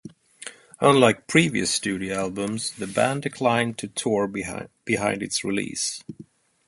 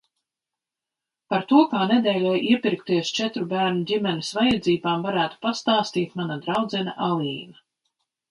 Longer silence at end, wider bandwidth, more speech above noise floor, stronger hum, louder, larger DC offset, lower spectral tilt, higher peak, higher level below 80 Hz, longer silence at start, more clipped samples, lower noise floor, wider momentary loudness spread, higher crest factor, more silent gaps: second, 0.45 s vs 0.8 s; about the same, 12 kHz vs 11.5 kHz; second, 20 dB vs 65 dB; neither; about the same, -23 LUFS vs -23 LUFS; neither; second, -4 dB/octave vs -5.5 dB/octave; about the same, -2 dBFS vs -4 dBFS; about the same, -58 dBFS vs -60 dBFS; second, 0.05 s vs 1.3 s; neither; second, -43 dBFS vs -87 dBFS; first, 17 LU vs 7 LU; about the same, 22 dB vs 20 dB; neither